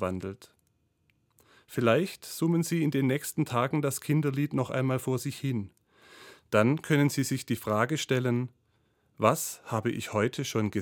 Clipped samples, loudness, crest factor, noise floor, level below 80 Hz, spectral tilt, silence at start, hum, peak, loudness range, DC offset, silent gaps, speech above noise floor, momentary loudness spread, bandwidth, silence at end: under 0.1%; -29 LUFS; 22 dB; -72 dBFS; -70 dBFS; -5.5 dB/octave; 0 s; none; -8 dBFS; 2 LU; under 0.1%; none; 44 dB; 8 LU; 18 kHz; 0 s